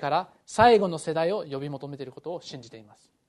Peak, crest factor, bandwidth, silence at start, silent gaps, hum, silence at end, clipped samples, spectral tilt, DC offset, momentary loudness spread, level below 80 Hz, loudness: -4 dBFS; 22 dB; 11.5 kHz; 0 s; none; none; 0.45 s; under 0.1%; -5 dB/octave; under 0.1%; 19 LU; -58 dBFS; -24 LUFS